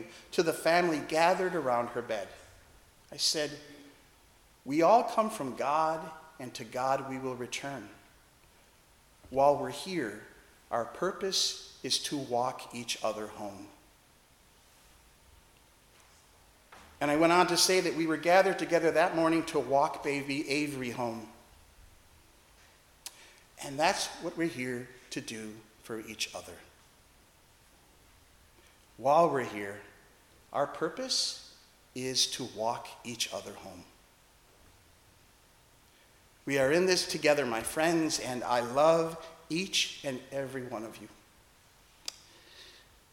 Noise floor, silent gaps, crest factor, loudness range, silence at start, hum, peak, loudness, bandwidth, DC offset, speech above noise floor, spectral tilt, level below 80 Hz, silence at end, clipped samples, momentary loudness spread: -62 dBFS; none; 24 dB; 13 LU; 0 s; none; -8 dBFS; -30 LUFS; 17.5 kHz; under 0.1%; 32 dB; -3 dB/octave; -66 dBFS; 0.4 s; under 0.1%; 20 LU